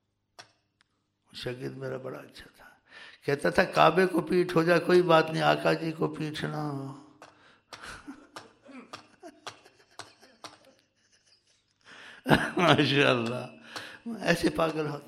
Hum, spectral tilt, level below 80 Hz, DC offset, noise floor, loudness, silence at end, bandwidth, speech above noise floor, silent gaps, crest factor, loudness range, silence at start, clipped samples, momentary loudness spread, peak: none; -5.5 dB/octave; -60 dBFS; under 0.1%; -72 dBFS; -26 LUFS; 0.05 s; 15 kHz; 46 dB; none; 24 dB; 22 LU; 0.4 s; under 0.1%; 26 LU; -6 dBFS